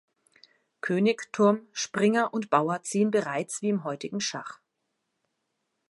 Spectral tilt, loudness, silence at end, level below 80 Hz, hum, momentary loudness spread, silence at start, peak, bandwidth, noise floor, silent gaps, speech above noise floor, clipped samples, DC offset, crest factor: -4.5 dB/octave; -27 LUFS; 1.35 s; -78 dBFS; none; 8 LU; 0.85 s; -6 dBFS; 11.5 kHz; -80 dBFS; none; 54 dB; under 0.1%; under 0.1%; 22 dB